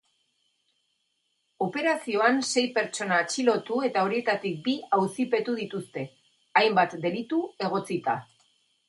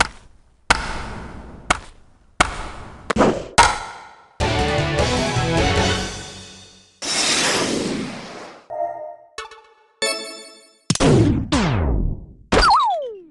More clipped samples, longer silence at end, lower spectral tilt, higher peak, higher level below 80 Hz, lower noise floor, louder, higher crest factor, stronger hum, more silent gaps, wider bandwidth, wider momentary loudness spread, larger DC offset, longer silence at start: neither; first, 0.65 s vs 0.1 s; about the same, -4 dB/octave vs -4 dB/octave; second, -6 dBFS vs 0 dBFS; second, -76 dBFS vs -32 dBFS; first, -75 dBFS vs -50 dBFS; second, -26 LUFS vs -19 LUFS; about the same, 22 dB vs 20 dB; neither; neither; about the same, 11.5 kHz vs 12.5 kHz; second, 9 LU vs 20 LU; neither; first, 1.6 s vs 0 s